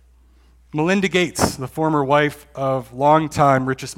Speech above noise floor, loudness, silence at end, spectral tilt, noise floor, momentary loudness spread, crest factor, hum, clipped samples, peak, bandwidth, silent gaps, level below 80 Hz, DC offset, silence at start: 33 dB; -19 LUFS; 0.05 s; -5 dB/octave; -52 dBFS; 7 LU; 18 dB; none; under 0.1%; 0 dBFS; 17 kHz; none; -48 dBFS; under 0.1%; 0.75 s